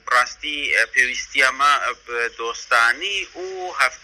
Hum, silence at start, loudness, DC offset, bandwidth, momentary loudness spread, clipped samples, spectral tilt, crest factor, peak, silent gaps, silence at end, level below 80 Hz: none; 0.05 s; -19 LUFS; under 0.1%; 14.5 kHz; 10 LU; under 0.1%; 0.5 dB/octave; 20 dB; 0 dBFS; none; 0.05 s; -56 dBFS